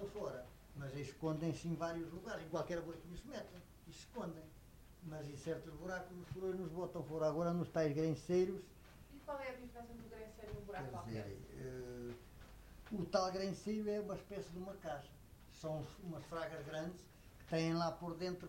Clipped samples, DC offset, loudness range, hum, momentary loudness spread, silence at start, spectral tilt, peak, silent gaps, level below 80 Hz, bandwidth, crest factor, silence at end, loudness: under 0.1%; under 0.1%; 9 LU; none; 19 LU; 0 s; -6.5 dB/octave; -22 dBFS; none; -64 dBFS; 16 kHz; 22 dB; 0 s; -44 LUFS